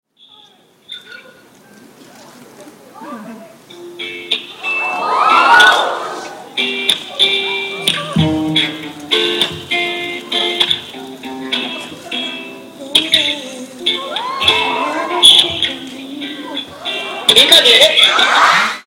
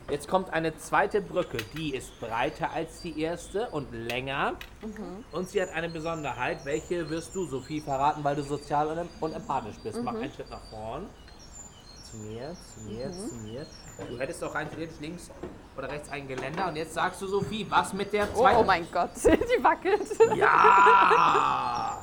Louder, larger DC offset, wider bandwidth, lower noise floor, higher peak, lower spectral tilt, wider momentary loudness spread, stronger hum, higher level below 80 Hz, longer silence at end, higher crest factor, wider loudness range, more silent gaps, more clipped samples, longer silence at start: first, -12 LUFS vs -27 LUFS; neither; second, 17 kHz vs 19 kHz; about the same, -47 dBFS vs -48 dBFS; first, 0 dBFS vs -6 dBFS; second, -2 dB/octave vs -4.5 dB/octave; about the same, 21 LU vs 19 LU; neither; about the same, -52 dBFS vs -50 dBFS; about the same, 0.05 s vs 0 s; second, 16 dB vs 22 dB; second, 9 LU vs 17 LU; neither; neither; first, 0.9 s vs 0 s